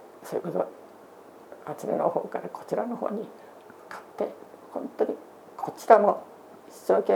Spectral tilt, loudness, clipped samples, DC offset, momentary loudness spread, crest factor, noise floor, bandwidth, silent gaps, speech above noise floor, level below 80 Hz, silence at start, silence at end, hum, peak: -6.5 dB/octave; -28 LUFS; under 0.1%; under 0.1%; 27 LU; 28 dB; -49 dBFS; 19.5 kHz; none; 23 dB; -82 dBFS; 0 s; 0 s; none; 0 dBFS